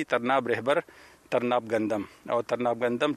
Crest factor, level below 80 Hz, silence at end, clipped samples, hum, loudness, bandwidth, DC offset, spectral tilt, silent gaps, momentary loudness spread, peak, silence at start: 18 dB; -68 dBFS; 0 s; under 0.1%; none; -28 LUFS; 13.5 kHz; under 0.1%; -5.5 dB/octave; none; 5 LU; -10 dBFS; 0 s